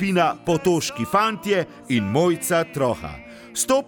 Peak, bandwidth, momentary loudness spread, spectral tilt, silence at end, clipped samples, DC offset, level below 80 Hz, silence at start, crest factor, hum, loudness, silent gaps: -4 dBFS; over 20 kHz; 8 LU; -4.5 dB/octave; 0 s; under 0.1%; under 0.1%; -52 dBFS; 0 s; 16 dB; none; -22 LUFS; none